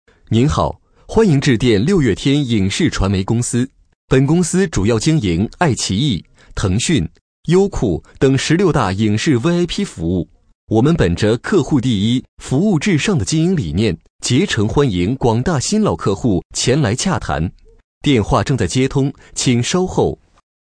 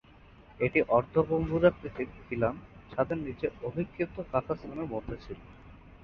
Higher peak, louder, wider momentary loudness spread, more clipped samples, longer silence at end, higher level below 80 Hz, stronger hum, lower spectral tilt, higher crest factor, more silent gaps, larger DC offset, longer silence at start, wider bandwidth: first, -2 dBFS vs -10 dBFS; first, -16 LUFS vs -31 LUFS; second, 7 LU vs 14 LU; neither; first, 0.45 s vs 0.05 s; first, -34 dBFS vs -52 dBFS; neither; second, -5.5 dB/octave vs -9.5 dB/octave; second, 14 dB vs 20 dB; first, 3.95-4.08 s, 7.21-7.43 s, 10.55-10.67 s, 12.28-12.37 s, 14.10-14.19 s, 16.45-16.50 s, 17.84-18.01 s vs none; neither; second, 0.3 s vs 0.5 s; first, 10.5 kHz vs 6 kHz